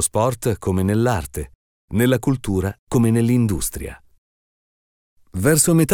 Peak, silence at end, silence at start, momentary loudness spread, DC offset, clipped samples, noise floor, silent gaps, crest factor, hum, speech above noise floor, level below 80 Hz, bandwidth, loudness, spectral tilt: -4 dBFS; 0 s; 0 s; 16 LU; under 0.1%; under 0.1%; under -90 dBFS; 1.55-1.88 s, 2.79-2.87 s, 4.18-5.16 s; 16 dB; none; over 72 dB; -40 dBFS; 19 kHz; -19 LUFS; -5.5 dB/octave